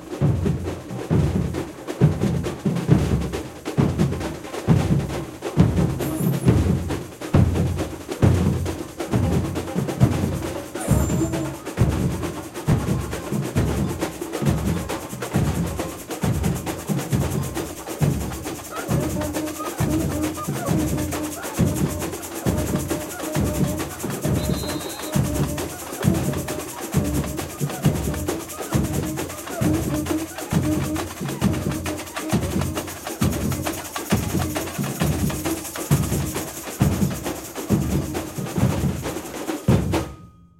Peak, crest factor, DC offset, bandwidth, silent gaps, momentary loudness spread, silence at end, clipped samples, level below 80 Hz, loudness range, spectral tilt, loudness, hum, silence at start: -2 dBFS; 20 dB; under 0.1%; 16 kHz; none; 9 LU; 0.3 s; under 0.1%; -36 dBFS; 3 LU; -6 dB/octave; -24 LUFS; none; 0 s